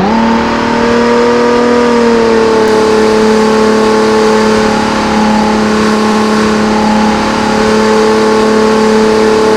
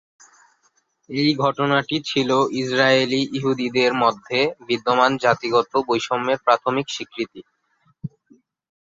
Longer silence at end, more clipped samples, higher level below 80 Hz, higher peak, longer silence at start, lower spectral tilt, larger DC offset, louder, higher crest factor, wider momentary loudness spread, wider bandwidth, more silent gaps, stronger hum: second, 0 s vs 0.75 s; first, 1% vs under 0.1%; first, -32 dBFS vs -64 dBFS; about the same, 0 dBFS vs -2 dBFS; second, 0 s vs 1.1 s; about the same, -5 dB/octave vs -5 dB/octave; neither; first, -8 LUFS vs -20 LUFS; second, 8 dB vs 20 dB; second, 2 LU vs 12 LU; first, 13 kHz vs 7.8 kHz; neither; neither